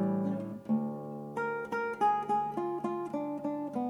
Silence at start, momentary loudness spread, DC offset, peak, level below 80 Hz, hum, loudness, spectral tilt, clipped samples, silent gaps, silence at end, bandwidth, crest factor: 0 s; 8 LU; under 0.1%; -18 dBFS; -76 dBFS; none; -34 LUFS; -8 dB/octave; under 0.1%; none; 0 s; 12 kHz; 14 dB